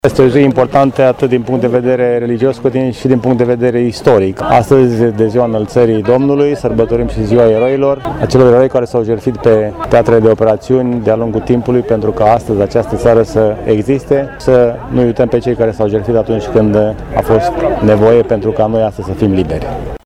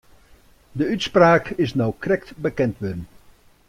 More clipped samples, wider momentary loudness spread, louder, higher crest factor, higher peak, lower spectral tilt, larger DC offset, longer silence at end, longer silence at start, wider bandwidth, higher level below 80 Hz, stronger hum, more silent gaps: first, 0.1% vs under 0.1%; second, 5 LU vs 15 LU; first, -11 LUFS vs -21 LUFS; second, 10 dB vs 20 dB; first, 0 dBFS vs -4 dBFS; first, -8 dB/octave vs -6.5 dB/octave; neither; second, 0.1 s vs 0.6 s; second, 0.05 s vs 0.75 s; second, 13 kHz vs 15 kHz; first, -32 dBFS vs -48 dBFS; neither; neither